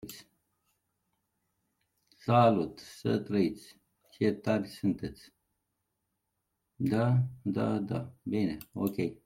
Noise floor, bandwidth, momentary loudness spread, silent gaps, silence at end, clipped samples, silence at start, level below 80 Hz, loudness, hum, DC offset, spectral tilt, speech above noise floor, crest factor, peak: -83 dBFS; 16.5 kHz; 13 LU; none; 0.1 s; under 0.1%; 0.05 s; -66 dBFS; -31 LUFS; none; under 0.1%; -8 dB/octave; 53 dB; 22 dB; -10 dBFS